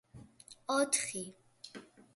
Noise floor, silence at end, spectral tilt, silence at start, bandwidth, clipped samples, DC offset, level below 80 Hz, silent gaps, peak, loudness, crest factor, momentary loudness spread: -57 dBFS; 0.3 s; -2 dB/octave; 0.15 s; 12 kHz; under 0.1%; under 0.1%; -74 dBFS; none; -16 dBFS; -33 LUFS; 22 dB; 24 LU